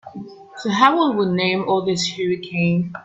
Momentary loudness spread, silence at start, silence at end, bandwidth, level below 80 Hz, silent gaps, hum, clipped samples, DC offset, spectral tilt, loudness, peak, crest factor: 17 LU; 0.05 s; 0 s; 8.2 kHz; -60 dBFS; none; none; under 0.1%; under 0.1%; -5.5 dB/octave; -19 LUFS; 0 dBFS; 20 dB